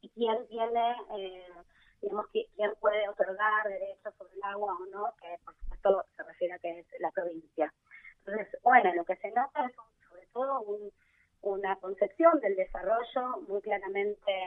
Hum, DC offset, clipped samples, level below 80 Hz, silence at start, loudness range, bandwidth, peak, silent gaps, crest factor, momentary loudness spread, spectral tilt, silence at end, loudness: none; under 0.1%; under 0.1%; -56 dBFS; 0.05 s; 5 LU; 4 kHz; -10 dBFS; none; 22 dB; 16 LU; -7 dB/octave; 0 s; -32 LUFS